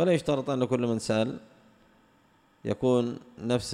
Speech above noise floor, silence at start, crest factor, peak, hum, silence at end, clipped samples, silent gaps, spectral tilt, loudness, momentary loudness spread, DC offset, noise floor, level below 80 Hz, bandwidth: 36 dB; 0 s; 16 dB; -12 dBFS; none; 0 s; under 0.1%; none; -6 dB/octave; -28 LUFS; 11 LU; under 0.1%; -63 dBFS; -60 dBFS; 12.5 kHz